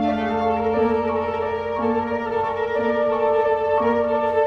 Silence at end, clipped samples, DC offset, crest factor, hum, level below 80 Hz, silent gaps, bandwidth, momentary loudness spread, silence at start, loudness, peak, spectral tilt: 0 s; under 0.1%; under 0.1%; 12 dB; none; -50 dBFS; none; 6.4 kHz; 4 LU; 0 s; -21 LUFS; -8 dBFS; -7.5 dB/octave